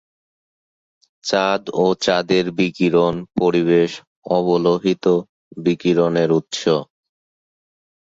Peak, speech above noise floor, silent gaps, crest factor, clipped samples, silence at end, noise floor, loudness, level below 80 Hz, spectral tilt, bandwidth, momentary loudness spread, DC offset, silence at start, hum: -4 dBFS; over 73 dB; 4.07-4.22 s, 5.29-5.51 s; 16 dB; under 0.1%; 1.15 s; under -90 dBFS; -18 LUFS; -56 dBFS; -6 dB/octave; 7.8 kHz; 5 LU; under 0.1%; 1.25 s; none